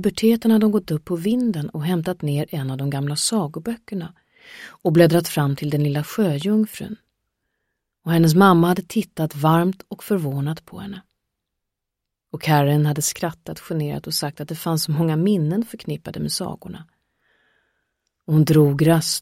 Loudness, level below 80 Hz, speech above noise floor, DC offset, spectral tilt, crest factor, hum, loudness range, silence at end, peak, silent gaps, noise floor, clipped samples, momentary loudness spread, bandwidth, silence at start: -20 LUFS; -56 dBFS; 62 dB; under 0.1%; -6 dB/octave; 18 dB; none; 5 LU; 0 s; -2 dBFS; none; -82 dBFS; under 0.1%; 18 LU; 16.5 kHz; 0 s